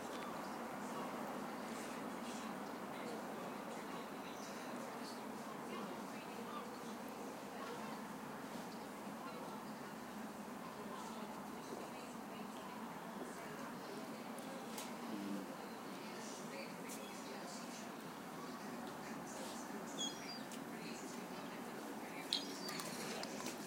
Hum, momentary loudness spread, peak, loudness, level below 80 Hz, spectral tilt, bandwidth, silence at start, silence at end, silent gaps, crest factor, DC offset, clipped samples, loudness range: none; 5 LU; -18 dBFS; -48 LUFS; -80 dBFS; -3.5 dB/octave; 16 kHz; 0 s; 0 s; none; 30 dB; under 0.1%; under 0.1%; 3 LU